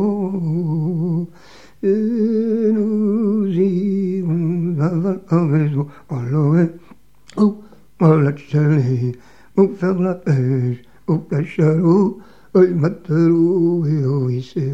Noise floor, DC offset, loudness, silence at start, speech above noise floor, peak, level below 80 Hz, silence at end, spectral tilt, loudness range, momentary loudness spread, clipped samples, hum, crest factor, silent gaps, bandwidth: -46 dBFS; 0.5%; -18 LUFS; 0 s; 29 dB; 0 dBFS; -58 dBFS; 0 s; -10 dB/octave; 3 LU; 8 LU; under 0.1%; none; 18 dB; none; 7.6 kHz